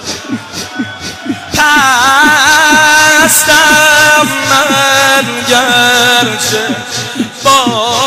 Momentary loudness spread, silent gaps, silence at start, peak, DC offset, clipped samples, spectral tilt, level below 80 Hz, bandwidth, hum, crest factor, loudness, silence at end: 15 LU; none; 0 s; 0 dBFS; under 0.1%; 0.4%; -1.5 dB/octave; -42 dBFS; 16.5 kHz; none; 8 dB; -6 LUFS; 0 s